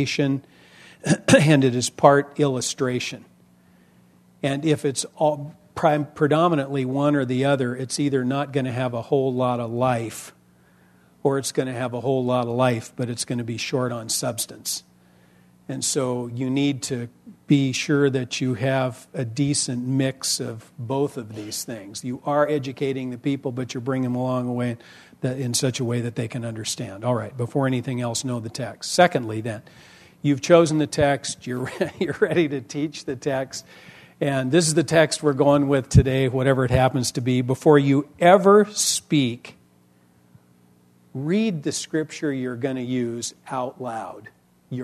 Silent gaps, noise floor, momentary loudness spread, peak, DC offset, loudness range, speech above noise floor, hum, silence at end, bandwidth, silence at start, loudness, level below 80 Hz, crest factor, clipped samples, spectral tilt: none; -58 dBFS; 13 LU; 0 dBFS; under 0.1%; 7 LU; 35 dB; none; 0 s; 13.5 kHz; 0 s; -22 LUFS; -48 dBFS; 22 dB; under 0.1%; -5 dB/octave